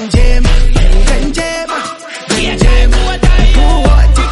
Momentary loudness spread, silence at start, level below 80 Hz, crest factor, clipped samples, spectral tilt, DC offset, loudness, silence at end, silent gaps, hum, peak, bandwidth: 7 LU; 0 s; -8 dBFS; 8 dB; under 0.1%; -5 dB/octave; under 0.1%; -12 LUFS; 0 s; none; none; 0 dBFS; 11.5 kHz